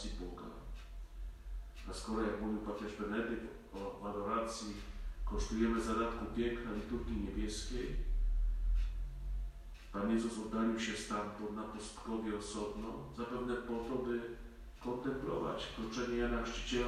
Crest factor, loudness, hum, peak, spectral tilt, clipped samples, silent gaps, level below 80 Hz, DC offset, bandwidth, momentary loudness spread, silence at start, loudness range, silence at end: 16 dB; -40 LUFS; none; -22 dBFS; -5 dB/octave; under 0.1%; none; -44 dBFS; under 0.1%; 12.5 kHz; 13 LU; 0 s; 3 LU; 0 s